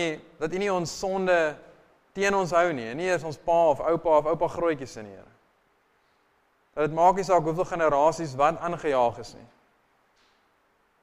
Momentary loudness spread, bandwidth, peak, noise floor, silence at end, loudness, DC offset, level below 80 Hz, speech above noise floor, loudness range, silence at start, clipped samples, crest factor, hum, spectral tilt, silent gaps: 14 LU; 14.5 kHz; -8 dBFS; -67 dBFS; 1.55 s; -25 LUFS; under 0.1%; -54 dBFS; 42 dB; 3 LU; 0 s; under 0.1%; 20 dB; none; -5 dB/octave; none